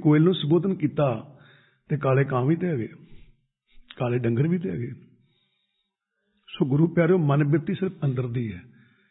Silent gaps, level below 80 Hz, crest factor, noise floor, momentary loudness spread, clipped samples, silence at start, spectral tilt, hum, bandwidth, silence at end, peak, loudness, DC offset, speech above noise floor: none; -60 dBFS; 18 dB; -78 dBFS; 13 LU; under 0.1%; 0 s; -12.5 dB/octave; none; 4.1 kHz; 0.5 s; -8 dBFS; -24 LUFS; under 0.1%; 55 dB